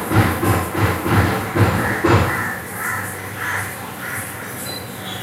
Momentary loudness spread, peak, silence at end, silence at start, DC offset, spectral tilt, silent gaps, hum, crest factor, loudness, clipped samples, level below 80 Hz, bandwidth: 11 LU; -2 dBFS; 0 s; 0 s; under 0.1%; -5.5 dB/octave; none; none; 18 dB; -20 LUFS; under 0.1%; -38 dBFS; 16 kHz